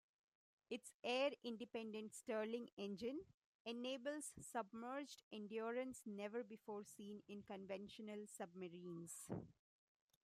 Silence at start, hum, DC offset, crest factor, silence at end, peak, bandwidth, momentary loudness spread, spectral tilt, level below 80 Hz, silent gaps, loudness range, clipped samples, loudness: 0.7 s; none; under 0.1%; 20 dB; 0.7 s; -30 dBFS; 15 kHz; 10 LU; -4 dB/octave; -86 dBFS; 0.94-1.03 s, 2.73-2.77 s, 3.34-3.65 s, 5.23-5.31 s; 6 LU; under 0.1%; -50 LUFS